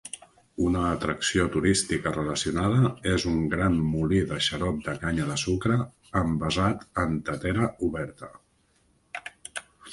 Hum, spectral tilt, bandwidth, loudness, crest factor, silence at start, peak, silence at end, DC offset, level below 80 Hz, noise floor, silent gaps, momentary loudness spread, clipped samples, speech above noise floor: none; -5 dB/octave; 11.5 kHz; -26 LUFS; 18 dB; 0.05 s; -8 dBFS; 0 s; under 0.1%; -42 dBFS; -66 dBFS; none; 15 LU; under 0.1%; 40 dB